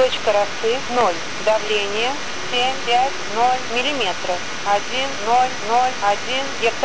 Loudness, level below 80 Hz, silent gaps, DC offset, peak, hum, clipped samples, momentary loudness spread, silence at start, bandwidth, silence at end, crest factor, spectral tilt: -20 LUFS; -52 dBFS; none; 4%; -6 dBFS; none; under 0.1%; 4 LU; 0 s; 8 kHz; 0 s; 14 dB; -2 dB/octave